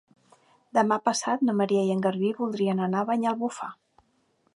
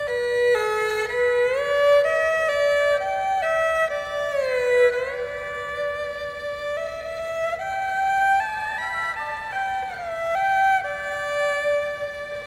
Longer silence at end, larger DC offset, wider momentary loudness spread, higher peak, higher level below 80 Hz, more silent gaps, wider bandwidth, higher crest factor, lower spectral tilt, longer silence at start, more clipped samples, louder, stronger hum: first, 0.85 s vs 0 s; neither; second, 6 LU vs 10 LU; about the same, -8 dBFS vs -8 dBFS; second, -76 dBFS vs -54 dBFS; neither; second, 11.5 kHz vs 16 kHz; first, 20 dB vs 14 dB; first, -5.5 dB/octave vs -2 dB/octave; first, 0.75 s vs 0 s; neither; second, -26 LUFS vs -23 LUFS; neither